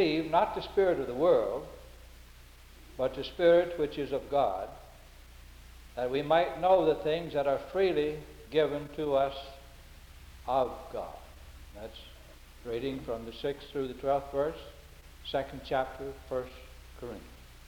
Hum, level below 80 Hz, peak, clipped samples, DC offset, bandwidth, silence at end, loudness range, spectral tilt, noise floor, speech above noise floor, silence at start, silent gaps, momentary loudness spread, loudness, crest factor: none; -52 dBFS; -12 dBFS; under 0.1%; under 0.1%; 20 kHz; 0 s; 8 LU; -6 dB/octave; -53 dBFS; 23 dB; 0 s; none; 22 LU; -31 LUFS; 20 dB